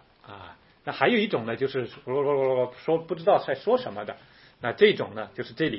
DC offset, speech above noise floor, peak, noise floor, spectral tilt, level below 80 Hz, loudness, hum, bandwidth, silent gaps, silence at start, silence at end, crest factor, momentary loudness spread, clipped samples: under 0.1%; 23 dB; -6 dBFS; -48 dBFS; -9.5 dB/octave; -66 dBFS; -26 LUFS; none; 5.8 kHz; none; 0.3 s; 0 s; 22 dB; 17 LU; under 0.1%